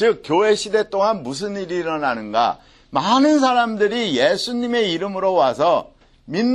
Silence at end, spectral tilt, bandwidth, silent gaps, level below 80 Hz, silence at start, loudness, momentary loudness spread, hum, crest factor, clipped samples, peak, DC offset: 0 s; -4.5 dB/octave; 12 kHz; none; -56 dBFS; 0 s; -19 LUFS; 9 LU; none; 16 dB; under 0.1%; -2 dBFS; under 0.1%